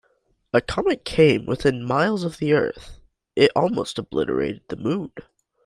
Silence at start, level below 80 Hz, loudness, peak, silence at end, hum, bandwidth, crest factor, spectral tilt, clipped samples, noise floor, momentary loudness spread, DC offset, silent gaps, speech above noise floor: 0.55 s; -48 dBFS; -22 LUFS; -2 dBFS; 0.45 s; none; 11.5 kHz; 20 dB; -6 dB/octave; under 0.1%; -66 dBFS; 11 LU; under 0.1%; none; 45 dB